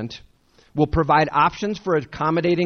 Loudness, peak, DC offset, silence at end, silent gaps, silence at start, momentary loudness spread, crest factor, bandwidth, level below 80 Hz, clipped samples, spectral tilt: -20 LUFS; -4 dBFS; under 0.1%; 0 s; none; 0 s; 14 LU; 18 dB; 6.6 kHz; -40 dBFS; under 0.1%; -7 dB/octave